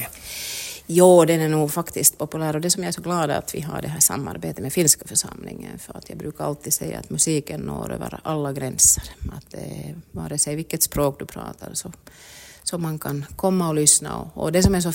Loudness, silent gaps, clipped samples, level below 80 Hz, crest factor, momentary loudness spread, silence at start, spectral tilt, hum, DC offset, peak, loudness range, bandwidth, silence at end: -21 LUFS; none; under 0.1%; -42 dBFS; 22 dB; 20 LU; 0 s; -4 dB/octave; none; under 0.1%; 0 dBFS; 7 LU; 16.5 kHz; 0 s